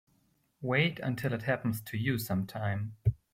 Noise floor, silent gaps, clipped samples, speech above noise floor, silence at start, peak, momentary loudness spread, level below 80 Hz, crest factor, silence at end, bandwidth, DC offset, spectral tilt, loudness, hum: -72 dBFS; none; under 0.1%; 40 dB; 0.6 s; -14 dBFS; 6 LU; -54 dBFS; 18 dB; 0.2 s; 16.5 kHz; under 0.1%; -6.5 dB/octave; -32 LUFS; none